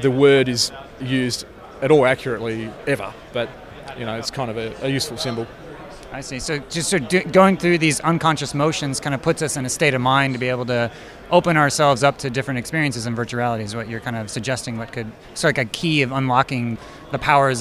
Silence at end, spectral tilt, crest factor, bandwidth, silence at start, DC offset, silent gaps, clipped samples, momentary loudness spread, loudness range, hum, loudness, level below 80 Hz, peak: 0 s; -4.5 dB/octave; 18 dB; 15.5 kHz; 0 s; under 0.1%; none; under 0.1%; 14 LU; 7 LU; none; -20 LUFS; -48 dBFS; -2 dBFS